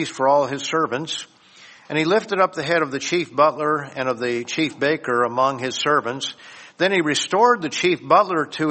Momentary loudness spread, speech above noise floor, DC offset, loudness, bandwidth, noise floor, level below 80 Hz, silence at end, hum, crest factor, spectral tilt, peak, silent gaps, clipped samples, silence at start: 9 LU; 27 dB; under 0.1%; -20 LUFS; 8.8 kHz; -47 dBFS; -66 dBFS; 0 s; none; 20 dB; -4 dB/octave; -2 dBFS; none; under 0.1%; 0 s